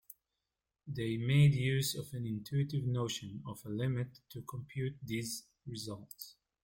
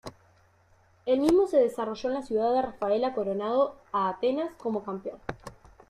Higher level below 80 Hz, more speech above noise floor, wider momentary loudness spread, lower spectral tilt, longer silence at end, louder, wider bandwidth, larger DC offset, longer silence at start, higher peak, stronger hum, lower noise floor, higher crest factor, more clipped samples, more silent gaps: second, -66 dBFS vs -60 dBFS; first, 54 dB vs 35 dB; about the same, 18 LU vs 16 LU; about the same, -5.5 dB/octave vs -6 dB/octave; about the same, 0.3 s vs 0.4 s; second, -36 LUFS vs -27 LUFS; about the same, 16.5 kHz vs 15 kHz; neither; about the same, 0.1 s vs 0.05 s; second, -16 dBFS vs -8 dBFS; neither; first, -90 dBFS vs -62 dBFS; about the same, 20 dB vs 20 dB; neither; neither